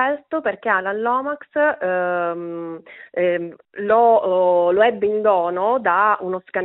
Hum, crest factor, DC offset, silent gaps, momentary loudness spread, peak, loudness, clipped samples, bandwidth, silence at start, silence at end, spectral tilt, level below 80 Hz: none; 16 dB; under 0.1%; none; 13 LU; -4 dBFS; -19 LUFS; under 0.1%; 4.1 kHz; 0 s; 0 s; -3 dB/octave; -66 dBFS